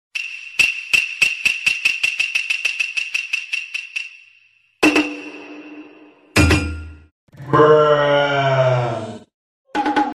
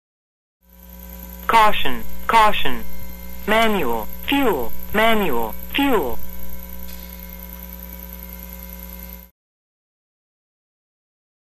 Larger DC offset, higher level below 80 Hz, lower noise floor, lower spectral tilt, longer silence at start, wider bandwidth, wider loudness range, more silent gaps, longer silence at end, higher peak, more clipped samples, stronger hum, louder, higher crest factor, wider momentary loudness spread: neither; about the same, -38 dBFS vs -38 dBFS; first, -56 dBFS vs -40 dBFS; about the same, -4.5 dB/octave vs -4.5 dB/octave; second, 0.15 s vs 0.9 s; about the same, 15.5 kHz vs 15.5 kHz; second, 5 LU vs 18 LU; first, 7.11-7.27 s, 9.34-9.65 s vs none; second, 0.05 s vs 2.3 s; about the same, 0 dBFS vs 0 dBFS; neither; neither; about the same, -17 LUFS vs -19 LUFS; about the same, 20 dB vs 20 dB; second, 17 LU vs 20 LU